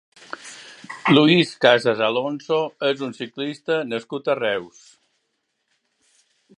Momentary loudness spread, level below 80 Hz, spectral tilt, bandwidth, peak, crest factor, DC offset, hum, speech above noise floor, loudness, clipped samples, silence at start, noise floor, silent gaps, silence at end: 21 LU; -70 dBFS; -5.5 dB/octave; 11 kHz; 0 dBFS; 22 dB; under 0.1%; none; 53 dB; -20 LUFS; under 0.1%; 0.3 s; -74 dBFS; none; 1.9 s